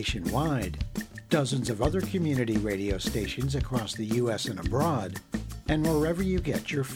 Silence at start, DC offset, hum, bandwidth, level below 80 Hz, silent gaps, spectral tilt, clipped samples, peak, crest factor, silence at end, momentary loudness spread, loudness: 0 s; under 0.1%; none; 17 kHz; -40 dBFS; none; -5.5 dB/octave; under 0.1%; -10 dBFS; 18 dB; 0 s; 8 LU; -29 LUFS